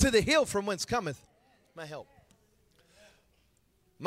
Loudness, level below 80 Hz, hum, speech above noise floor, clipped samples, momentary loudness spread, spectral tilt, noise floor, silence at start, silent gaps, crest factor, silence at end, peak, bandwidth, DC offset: -29 LUFS; -48 dBFS; none; 40 dB; under 0.1%; 22 LU; -4 dB/octave; -70 dBFS; 0 s; none; 22 dB; 0 s; -12 dBFS; 16 kHz; under 0.1%